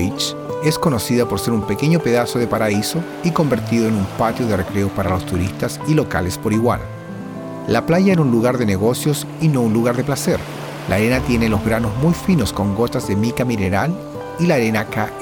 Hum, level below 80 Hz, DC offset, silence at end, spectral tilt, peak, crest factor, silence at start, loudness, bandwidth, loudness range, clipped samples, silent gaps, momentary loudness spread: none; -40 dBFS; 0.1%; 0 s; -6 dB/octave; -2 dBFS; 16 dB; 0 s; -18 LUFS; 19.5 kHz; 2 LU; under 0.1%; none; 6 LU